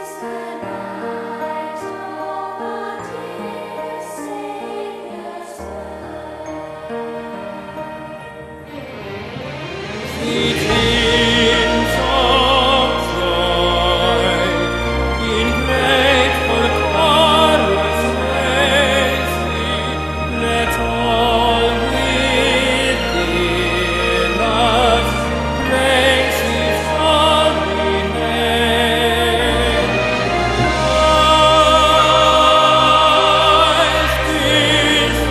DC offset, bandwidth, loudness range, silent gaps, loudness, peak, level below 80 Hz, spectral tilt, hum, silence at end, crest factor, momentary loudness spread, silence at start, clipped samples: under 0.1%; 14 kHz; 17 LU; none; -14 LUFS; 0 dBFS; -28 dBFS; -4 dB/octave; none; 0 s; 16 dB; 18 LU; 0 s; under 0.1%